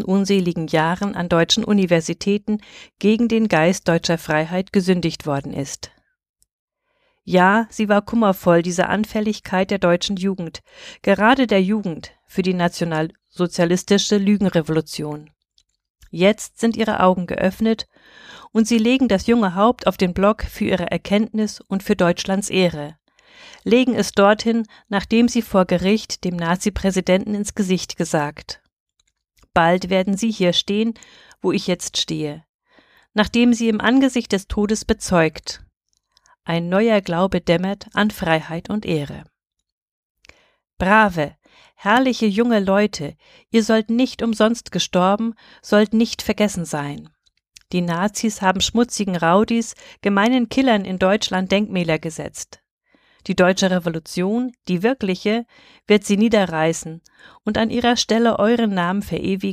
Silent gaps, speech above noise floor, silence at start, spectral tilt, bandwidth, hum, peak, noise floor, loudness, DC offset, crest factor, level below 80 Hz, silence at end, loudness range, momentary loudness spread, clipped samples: 6.29-6.34 s, 6.53-6.68 s, 15.90-15.95 s, 28.80-28.86 s, 32.49-32.59 s, 39.72-40.15 s, 52.71-52.78 s; 50 dB; 0 s; -5 dB/octave; 15.5 kHz; none; -2 dBFS; -69 dBFS; -19 LUFS; under 0.1%; 18 dB; -46 dBFS; 0 s; 3 LU; 11 LU; under 0.1%